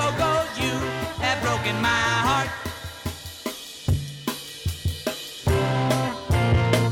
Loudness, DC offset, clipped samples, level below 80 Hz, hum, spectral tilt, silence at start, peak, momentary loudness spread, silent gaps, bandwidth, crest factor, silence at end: -24 LUFS; under 0.1%; under 0.1%; -38 dBFS; none; -5 dB/octave; 0 s; -6 dBFS; 12 LU; none; 18 kHz; 18 dB; 0 s